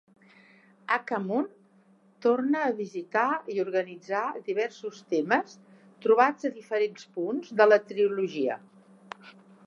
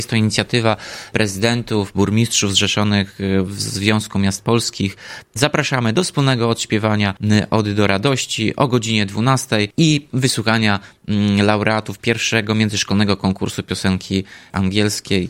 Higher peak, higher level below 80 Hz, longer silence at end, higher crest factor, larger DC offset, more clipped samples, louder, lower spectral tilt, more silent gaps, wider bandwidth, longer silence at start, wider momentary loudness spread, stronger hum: second, -6 dBFS vs 0 dBFS; second, -88 dBFS vs -50 dBFS; first, 0.35 s vs 0 s; about the same, 22 dB vs 18 dB; neither; neither; second, -27 LUFS vs -17 LUFS; about the same, -5.5 dB/octave vs -4.5 dB/octave; neither; second, 7.4 kHz vs 16.5 kHz; first, 0.9 s vs 0 s; first, 16 LU vs 6 LU; neither